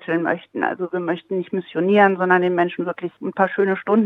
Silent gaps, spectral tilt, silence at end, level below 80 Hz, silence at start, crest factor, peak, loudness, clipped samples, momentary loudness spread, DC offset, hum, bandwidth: none; -9 dB/octave; 0 s; -72 dBFS; 0 s; 18 dB; -2 dBFS; -20 LUFS; under 0.1%; 11 LU; under 0.1%; none; 4 kHz